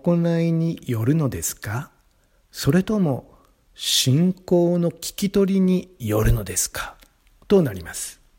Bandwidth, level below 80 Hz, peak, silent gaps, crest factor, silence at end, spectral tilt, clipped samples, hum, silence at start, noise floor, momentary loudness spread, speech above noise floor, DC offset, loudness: 16.5 kHz; -36 dBFS; -4 dBFS; none; 18 dB; 0.25 s; -5 dB/octave; under 0.1%; none; 0.05 s; -60 dBFS; 12 LU; 40 dB; under 0.1%; -22 LUFS